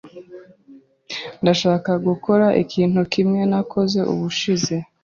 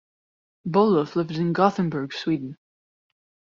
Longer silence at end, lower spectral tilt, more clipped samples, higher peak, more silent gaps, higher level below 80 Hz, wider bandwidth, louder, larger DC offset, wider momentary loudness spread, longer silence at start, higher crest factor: second, 0.2 s vs 1 s; about the same, -6 dB/octave vs -6 dB/octave; neither; about the same, -2 dBFS vs -4 dBFS; neither; first, -58 dBFS vs -66 dBFS; about the same, 7.4 kHz vs 7.4 kHz; first, -19 LUFS vs -23 LUFS; neither; about the same, 8 LU vs 9 LU; second, 0.05 s vs 0.65 s; about the same, 18 dB vs 22 dB